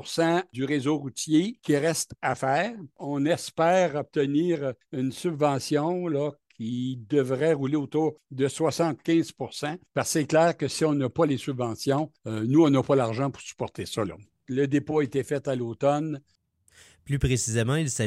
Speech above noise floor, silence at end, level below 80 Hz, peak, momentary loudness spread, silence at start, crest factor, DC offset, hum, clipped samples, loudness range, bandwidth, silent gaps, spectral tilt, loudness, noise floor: 33 dB; 0 s; -52 dBFS; -8 dBFS; 10 LU; 0 s; 18 dB; under 0.1%; none; under 0.1%; 3 LU; 15 kHz; none; -5.5 dB/octave; -26 LUFS; -58 dBFS